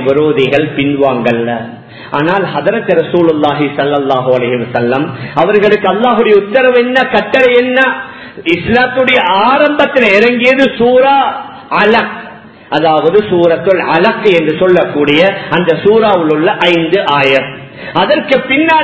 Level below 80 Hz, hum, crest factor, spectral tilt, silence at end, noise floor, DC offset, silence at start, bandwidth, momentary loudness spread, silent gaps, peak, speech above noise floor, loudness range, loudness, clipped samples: -46 dBFS; none; 10 dB; -6.5 dB/octave; 0 s; -31 dBFS; 0.2%; 0 s; 8 kHz; 7 LU; none; 0 dBFS; 22 dB; 3 LU; -10 LUFS; 0.5%